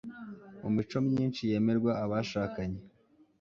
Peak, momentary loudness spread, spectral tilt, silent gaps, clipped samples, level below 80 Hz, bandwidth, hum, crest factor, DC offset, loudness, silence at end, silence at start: -18 dBFS; 16 LU; -7.5 dB/octave; none; under 0.1%; -58 dBFS; 7.2 kHz; none; 16 dB; under 0.1%; -32 LUFS; 0.55 s; 0.05 s